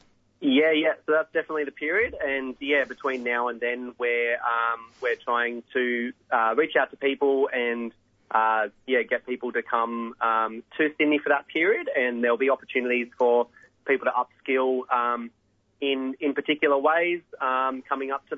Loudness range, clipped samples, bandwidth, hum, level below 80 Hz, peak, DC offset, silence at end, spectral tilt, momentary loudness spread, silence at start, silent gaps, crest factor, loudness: 2 LU; under 0.1%; 6.6 kHz; none; -66 dBFS; -8 dBFS; under 0.1%; 0 s; -5.5 dB/octave; 7 LU; 0.4 s; none; 18 dB; -25 LUFS